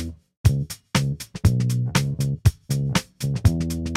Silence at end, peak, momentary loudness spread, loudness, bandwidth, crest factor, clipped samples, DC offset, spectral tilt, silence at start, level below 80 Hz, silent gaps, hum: 0 s; -4 dBFS; 6 LU; -23 LUFS; 16 kHz; 18 dB; under 0.1%; under 0.1%; -5.5 dB/octave; 0 s; -34 dBFS; 0.37-0.44 s; none